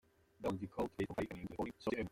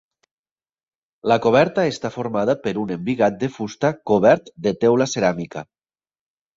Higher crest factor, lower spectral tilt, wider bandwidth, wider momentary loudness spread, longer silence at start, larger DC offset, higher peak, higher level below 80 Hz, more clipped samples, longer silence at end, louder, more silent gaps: about the same, 18 dB vs 20 dB; about the same, -7 dB/octave vs -6 dB/octave; first, 16.5 kHz vs 7.8 kHz; second, 4 LU vs 11 LU; second, 0.4 s vs 1.25 s; neither; second, -24 dBFS vs -2 dBFS; second, -64 dBFS vs -58 dBFS; neither; second, 0.05 s vs 0.95 s; second, -43 LUFS vs -20 LUFS; neither